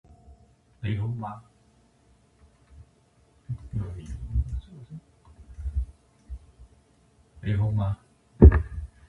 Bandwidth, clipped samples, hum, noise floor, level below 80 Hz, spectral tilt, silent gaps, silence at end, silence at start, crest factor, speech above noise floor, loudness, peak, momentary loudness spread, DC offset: 4 kHz; under 0.1%; none; -62 dBFS; -30 dBFS; -10 dB/octave; none; 0.25 s; 0.85 s; 26 dB; 35 dB; -26 LUFS; -2 dBFS; 28 LU; under 0.1%